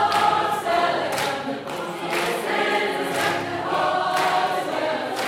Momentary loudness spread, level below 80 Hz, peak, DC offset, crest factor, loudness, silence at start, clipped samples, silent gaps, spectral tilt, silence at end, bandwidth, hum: 6 LU; -62 dBFS; -8 dBFS; under 0.1%; 16 dB; -23 LUFS; 0 s; under 0.1%; none; -3.5 dB/octave; 0 s; 16.5 kHz; none